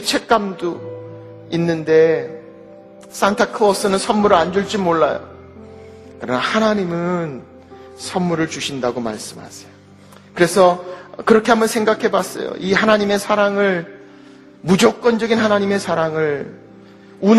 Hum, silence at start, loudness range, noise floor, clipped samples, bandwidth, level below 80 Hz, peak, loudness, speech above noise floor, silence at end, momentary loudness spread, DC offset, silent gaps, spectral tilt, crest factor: none; 0 s; 5 LU; -44 dBFS; under 0.1%; 13.5 kHz; -54 dBFS; 0 dBFS; -17 LUFS; 27 dB; 0 s; 18 LU; under 0.1%; none; -5 dB/octave; 18 dB